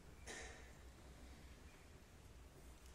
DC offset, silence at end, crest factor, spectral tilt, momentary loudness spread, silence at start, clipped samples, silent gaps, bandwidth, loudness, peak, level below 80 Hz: under 0.1%; 0 s; 18 dB; -3.5 dB/octave; 10 LU; 0 s; under 0.1%; none; 16 kHz; -59 LUFS; -40 dBFS; -62 dBFS